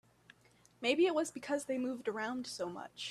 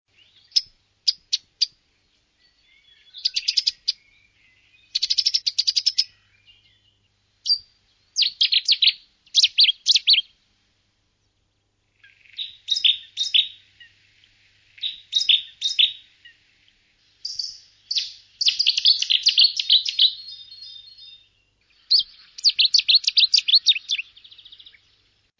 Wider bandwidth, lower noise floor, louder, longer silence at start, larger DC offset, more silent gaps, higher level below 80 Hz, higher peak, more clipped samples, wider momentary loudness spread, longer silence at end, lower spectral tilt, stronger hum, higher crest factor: first, 13.5 kHz vs 7.8 kHz; about the same, -67 dBFS vs -70 dBFS; second, -36 LUFS vs -18 LUFS; first, 0.8 s vs 0.55 s; neither; neither; second, -78 dBFS vs -72 dBFS; second, -18 dBFS vs -6 dBFS; neither; second, 11 LU vs 18 LU; second, 0 s vs 1.4 s; first, -3 dB/octave vs 5.5 dB/octave; neither; about the same, 18 dB vs 18 dB